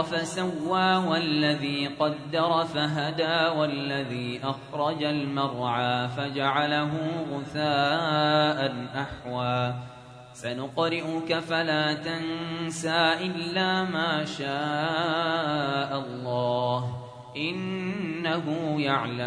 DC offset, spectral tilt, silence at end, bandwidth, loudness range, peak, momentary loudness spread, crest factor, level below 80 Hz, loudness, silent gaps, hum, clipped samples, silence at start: under 0.1%; -5.5 dB/octave; 0 s; 10.5 kHz; 3 LU; -8 dBFS; 8 LU; 18 dB; -62 dBFS; -27 LUFS; none; none; under 0.1%; 0 s